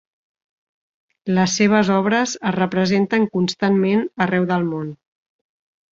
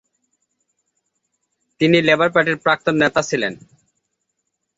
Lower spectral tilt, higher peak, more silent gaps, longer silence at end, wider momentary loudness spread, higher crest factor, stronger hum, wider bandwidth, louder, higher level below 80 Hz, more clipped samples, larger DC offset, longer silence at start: about the same, -5.5 dB/octave vs -5 dB/octave; about the same, -2 dBFS vs -2 dBFS; neither; second, 1 s vs 1.2 s; about the same, 7 LU vs 8 LU; about the same, 18 dB vs 20 dB; neither; about the same, 7.6 kHz vs 8 kHz; about the same, -19 LUFS vs -17 LUFS; about the same, -60 dBFS vs -60 dBFS; neither; neither; second, 1.25 s vs 1.8 s